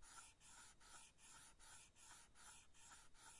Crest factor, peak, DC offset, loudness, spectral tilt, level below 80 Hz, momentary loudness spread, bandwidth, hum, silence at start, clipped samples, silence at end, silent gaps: 18 dB; -46 dBFS; under 0.1%; -64 LUFS; -0.5 dB/octave; -76 dBFS; 2 LU; 12 kHz; none; 0 s; under 0.1%; 0 s; none